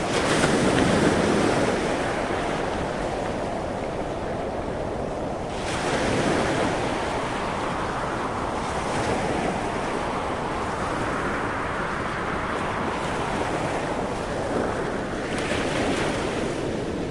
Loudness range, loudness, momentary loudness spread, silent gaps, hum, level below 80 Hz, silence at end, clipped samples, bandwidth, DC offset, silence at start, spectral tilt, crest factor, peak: 4 LU; -25 LUFS; 8 LU; none; none; -42 dBFS; 0 s; under 0.1%; 11.5 kHz; under 0.1%; 0 s; -5 dB/octave; 20 dB; -6 dBFS